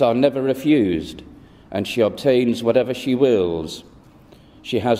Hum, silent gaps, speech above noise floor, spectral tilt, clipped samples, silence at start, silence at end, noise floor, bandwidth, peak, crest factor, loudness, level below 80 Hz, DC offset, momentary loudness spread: none; none; 29 dB; -6.5 dB/octave; under 0.1%; 0 s; 0 s; -47 dBFS; 15.5 kHz; -2 dBFS; 18 dB; -19 LUFS; -50 dBFS; under 0.1%; 15 LU